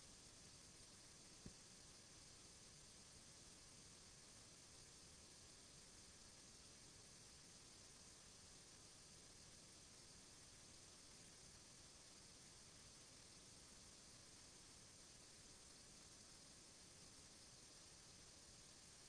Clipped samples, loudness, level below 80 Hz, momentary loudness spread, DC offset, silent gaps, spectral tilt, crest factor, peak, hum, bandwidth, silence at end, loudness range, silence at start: under 0.1%; -62 LUFS; -76 dBFS; 0 LU; under 0.1%; none; -2 dB/octave; 20 dB; -44 dBFS; none; 11 kHz; 0 s; 0 LU; 0 s